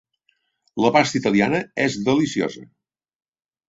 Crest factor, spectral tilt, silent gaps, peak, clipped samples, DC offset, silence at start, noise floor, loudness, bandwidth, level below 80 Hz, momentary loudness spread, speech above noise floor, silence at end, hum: 20 dB; -5 dB/octave; none; -2 dBFS; under 0.1%; under 0.1%; 0.75 s; -68 dBFS; -20 LUFS; 8 kHz; -60 dBFS; 10 LU; 48 dB; 1.05 s; none